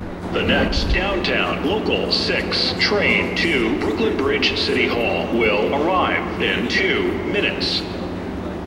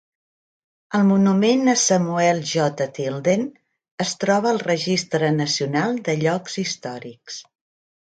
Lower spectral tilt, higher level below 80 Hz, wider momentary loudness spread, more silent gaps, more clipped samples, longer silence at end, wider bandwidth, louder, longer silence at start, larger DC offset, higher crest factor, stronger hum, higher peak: about the same, -5 dB/octave vs -4.5 dB/octave; first, -34 dBFS vs -66 dBFS; second, 4 LU vs 14 LU; second, none vs 3.91-3.98 s; neither; second, 0 s vs 0.65 s; first, 16 kHz vs 9.4 kHz; about the same, -19 LUFS vs -20 LUFS; second, 0 s vs 0.9 s; neither; about the same, 14 dB vs 16 dB; neither; about the same, -4 dBFS vs -4 dBFS